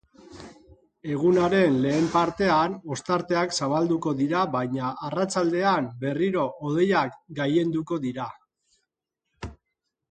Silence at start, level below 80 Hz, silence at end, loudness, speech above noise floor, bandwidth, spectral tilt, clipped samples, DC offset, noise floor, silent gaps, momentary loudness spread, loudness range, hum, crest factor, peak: 0.3 s; -56 dBFS; 0.55 s; -25 LUFS; 58 dB; 9.4 kHz; -6 dB/octave; under 0.1%; under 0.1%; -82 dBFS; none; 15 LU; 4 LU; none; 18 dB; -8 dBFS